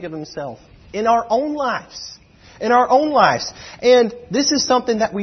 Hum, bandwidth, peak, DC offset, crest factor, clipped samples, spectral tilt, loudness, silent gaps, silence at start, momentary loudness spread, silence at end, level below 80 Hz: none; 6.4 kHz; 0 dBFS; under 0.1%; 18 dB; under 0.1%; -3.5 dB/octave; -17 LUFS; none; 0 s; 17 LU; 0 s; -54 dBFS